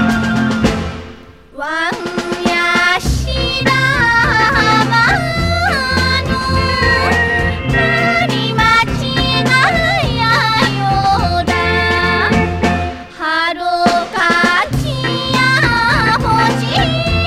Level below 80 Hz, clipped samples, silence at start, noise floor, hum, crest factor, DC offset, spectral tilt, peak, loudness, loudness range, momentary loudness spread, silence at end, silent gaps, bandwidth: -28 dBFS; under 0.1%; 0 s; -36 dBFS; none; 14 dB; under 0.1%; -5 dB/octave; 0 dBFS; -13 LUFS; 2 LU; 6 LU; 0 s; none; 15.5 kHz